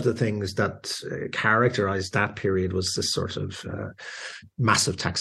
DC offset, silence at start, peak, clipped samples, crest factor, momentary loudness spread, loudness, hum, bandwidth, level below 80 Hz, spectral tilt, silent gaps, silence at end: under 0.1%; 0 s; -6 dBFS; under 0.1%; 20 dB; 14 LU; -25 LUFS; none; 12.5 kHz; -56 dBFS; -4 dB/octave; none; 0 s